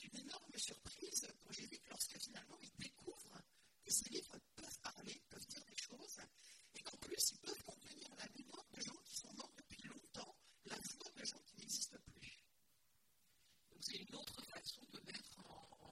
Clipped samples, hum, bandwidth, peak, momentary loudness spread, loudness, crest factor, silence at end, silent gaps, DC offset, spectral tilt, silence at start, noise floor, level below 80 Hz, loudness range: under 0.1%; none; 16 kHz; -24 dBFS; 17 LU; -49 LUFS; 28 dB; 0 s; none; under 0.1%; -1 dB/octave; 0 s; -80 dBFS; -78 dBFS; 6 LU